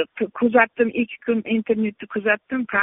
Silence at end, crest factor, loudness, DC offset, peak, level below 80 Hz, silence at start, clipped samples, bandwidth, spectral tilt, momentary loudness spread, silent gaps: 0 s; 20 dB; -21 LUFS; under 0.1%; -2 dBFS; -62 dBFS; 0 s; under 0.1%; 3.9 kHz; -0.5 dB/octave; 8 LU; none